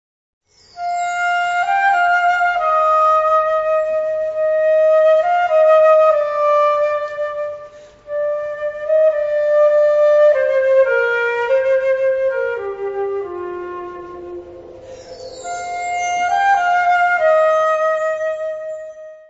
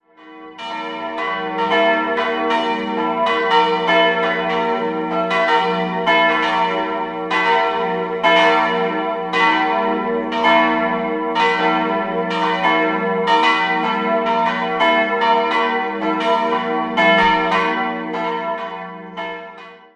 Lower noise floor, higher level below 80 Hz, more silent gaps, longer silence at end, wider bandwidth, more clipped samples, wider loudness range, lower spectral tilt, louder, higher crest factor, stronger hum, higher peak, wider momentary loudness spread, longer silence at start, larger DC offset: about the same, -38 dBFS vs -39 dBFS; about the same, -56 dBFS vs -54 dBFS; neither; about the same, 0.1 s vs 0.2 s; second, 8 kHz vs 9.6 kHz; neither; first, 9 LU vs 2 LU; second, -2.5 dB/octave vs -5 dB/octave; about the same, -16 LUFS vs -17 LUFS; about the same, 14 dB vs 16 dB; neither; about the same, -4 dBFS vs -2 dBFS; first, 16 LU vs 9 LU; first, 0.75 s vs 0.2 s; neither